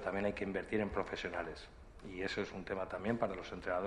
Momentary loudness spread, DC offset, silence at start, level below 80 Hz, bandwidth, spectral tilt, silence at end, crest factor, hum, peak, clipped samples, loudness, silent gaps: 11 LU; under 0.1%; 0 s; -58 dBFS; 11 kHz; -6 dB/octave; 0 s; 20 dB; none; -20 dBFS; under 0.1%; -40 LUFS; none